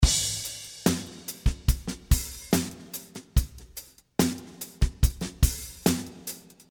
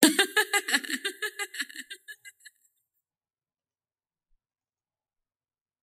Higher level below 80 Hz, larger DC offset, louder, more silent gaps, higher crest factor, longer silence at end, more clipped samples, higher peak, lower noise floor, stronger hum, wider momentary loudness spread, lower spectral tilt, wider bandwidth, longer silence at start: first, -30 dBFS vs -84 dBFS; neither; about the same, -29 LUFS vs -27 LUFS; neither; second, 22 dB vs 32 dB; second, 0.3 s vs 3.5 s; neither; second, -6 dBFS vs 0 dBFS; second, -47 dBFS vs under -90 dBFS; neither; second, 12 LU vs 20 LU; first, -4 dB/octave vs -0.5 dB/octave; first, 19.5 kHz vs 15.5 kHz; about the same, 0 s vs 0 s